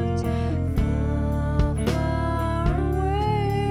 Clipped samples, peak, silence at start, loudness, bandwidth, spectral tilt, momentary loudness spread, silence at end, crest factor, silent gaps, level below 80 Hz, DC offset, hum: under 0.1%; -8 dBFS; 0 s; -24 LUFS; 14 kHz; -7.5 dB/octave; 2 LU; 0 s; 14 dB; none; -28 dBFS; under 0.1%; none